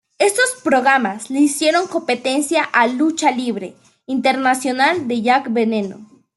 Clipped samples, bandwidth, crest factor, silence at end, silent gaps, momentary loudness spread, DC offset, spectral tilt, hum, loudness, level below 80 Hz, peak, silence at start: under 0.1%; 12.5 kHz; 16 dB; 0.35 s; none; 8 LU; under 0.1%; -3 dB/octave; none; -17 LUFS; -68 dBFS; -2 dBFS; 0.2 s